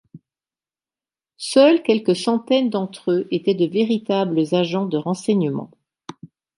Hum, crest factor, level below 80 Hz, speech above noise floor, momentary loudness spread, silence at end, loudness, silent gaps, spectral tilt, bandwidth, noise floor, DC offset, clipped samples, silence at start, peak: none; 18 dB; -70 dBFS; over 71 dB; 10 LU; 0.3 s; -19 LUFS; none; -6 dB/octave; 11.5 kHz; under -90 dBFS; under 0.1%; under 0.1%; 0.15 s; -2 dBFS